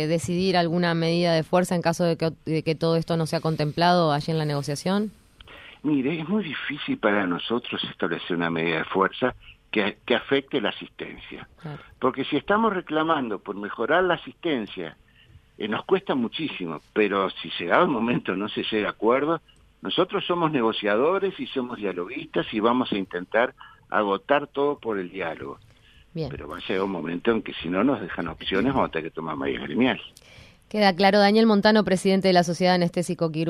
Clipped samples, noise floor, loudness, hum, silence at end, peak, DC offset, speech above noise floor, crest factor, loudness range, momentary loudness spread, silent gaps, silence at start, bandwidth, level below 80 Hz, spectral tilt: under 0.1%; -54 dBFS; -24 LUFS; none; 0 s; -4 dBFS; under 0.1%; 30 dB; 22 dB; 6 LU; 11 LU; none; 0 s; 13.5 kHz; -56 dBFS; -6 dB/octave